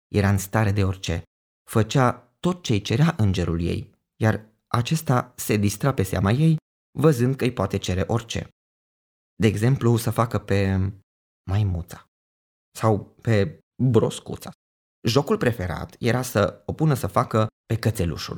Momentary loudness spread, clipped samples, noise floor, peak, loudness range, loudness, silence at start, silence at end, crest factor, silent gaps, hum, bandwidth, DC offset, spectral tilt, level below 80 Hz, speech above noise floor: 10 LU; under 0.1%; under -90 dBFS; -4 dBFS; 3 LU; -23 LUFS; 0.1 s; 0 s; 20 dB; 1.27-1.66 s, 6.62-6.93 s, 8.52-9.37 s, 11.03-11.45 s, 12.08-12.72 s, 13.63-13.71 s, 14.55-15.02 s, 17.52-17.64 s; none; over 20 kHz; under 0.1%; -6.5 dB/octave; -46 dBFS; over 68 dB